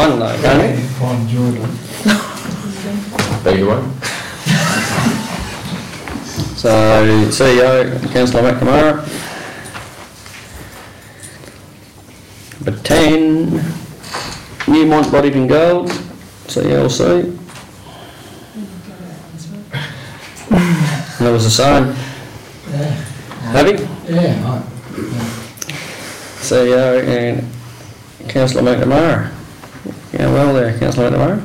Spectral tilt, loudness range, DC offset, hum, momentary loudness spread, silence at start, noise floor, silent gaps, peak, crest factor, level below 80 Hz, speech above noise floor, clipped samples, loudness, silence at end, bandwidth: -5.5 dB/octave; 7 LU; under 0.1%; none; 22 LU; 0 s; -39 dBFS; none; 0 dBFS; 16 dB; -38 dBFS; 26 dB; under 0.1%; -15 LUFS; 0 s; 16.5 kHz